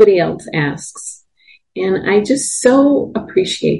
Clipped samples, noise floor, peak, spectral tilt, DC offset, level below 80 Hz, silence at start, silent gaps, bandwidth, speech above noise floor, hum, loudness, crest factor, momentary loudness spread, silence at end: under 0.1%; -50 dBFS; 0 dBFS; -4.5 dB/octave; under 0.1%; -50 dBFS; 0 s; none; 11.5 kHz; 36 dB; none; -15 LUFS; 14 dB; 16 LU; 0 s